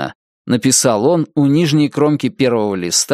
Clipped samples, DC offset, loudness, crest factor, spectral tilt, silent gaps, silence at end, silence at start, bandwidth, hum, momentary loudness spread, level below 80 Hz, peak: under 0.1%; under 0.1%; -14 LUFS; 14 dB; -4.5 dB/octave; 0.15-0.45 s; 0 s; 0 s; 15.5 kHz; none; 5 LU; -56 dBFS; 0 dBFS